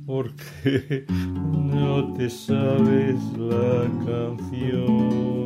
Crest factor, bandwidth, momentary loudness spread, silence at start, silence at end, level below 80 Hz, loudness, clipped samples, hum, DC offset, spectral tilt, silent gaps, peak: 14 dB; 15 kHz; 9 LU; 0 s; 0 s; -54 dBFS; -23 LUFS; under 0.1%; none; under 0.1%; -8 dB/octave; none; -8 dBFS